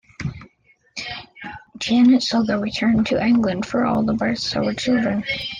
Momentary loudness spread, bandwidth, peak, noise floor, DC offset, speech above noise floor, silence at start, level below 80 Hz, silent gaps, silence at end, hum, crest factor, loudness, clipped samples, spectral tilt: 16 LU; 9.4 kHz; -6 dBFS; -58 dBFS; under 0.1%; 39 dB; 0.2 s; -48 dBFS; none; 0 s; none; 14 dB; -19 LUFS; under 0.1%; -5.5 dB/octave